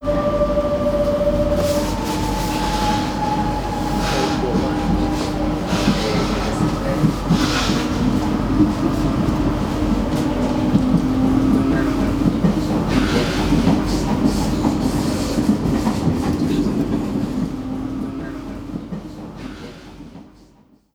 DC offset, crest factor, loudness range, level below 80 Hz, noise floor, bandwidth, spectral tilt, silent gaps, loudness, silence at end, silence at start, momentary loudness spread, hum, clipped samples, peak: under 0.1%; 16 dB; 5 LU; -30 dBFS; -52 dBFS; over 20 kHz; -6 dB/octave; none; -19 LUFS; 0.65 s; 0 s; 10 LU; none; under 0.1%; -4 dBFS